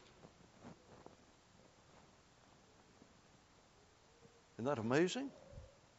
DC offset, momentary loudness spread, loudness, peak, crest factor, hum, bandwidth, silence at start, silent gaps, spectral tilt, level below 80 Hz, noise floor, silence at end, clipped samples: under 0.1%; 30 LU; -39 LUFS; -22 dBFS; 24 dB; none; 7.6 kHz; 0.25 s; none; -5 dB/octave; -72 dBFS; -68 dBFS; 0.3 s; under 0.1%